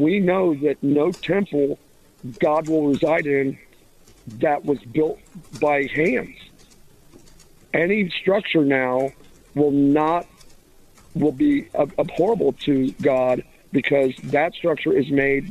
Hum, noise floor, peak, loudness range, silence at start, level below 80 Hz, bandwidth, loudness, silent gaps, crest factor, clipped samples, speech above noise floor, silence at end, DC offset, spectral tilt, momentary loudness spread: none; -51 dBFS; -6 dBFS; 3 LU; 0 s; -52 dBFS; 13 kHz; -21 LUFS; none; 16 dB; under 0.1%; 31 dB; 0 s; under 0.1%; -7 dB/octave; 8 LU